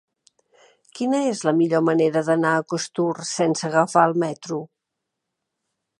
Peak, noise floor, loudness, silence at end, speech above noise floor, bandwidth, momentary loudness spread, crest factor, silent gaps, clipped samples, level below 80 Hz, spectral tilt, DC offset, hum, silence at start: -2 dBFS; -81 dBFS; -21 LUFS; 1.35 s; 61 dB; 11.5 kHz; 9 LU; 20 dB; none; under 0.1%; -74 dBFS; -5 dB/octave; under 0.1%; none; 0.95 s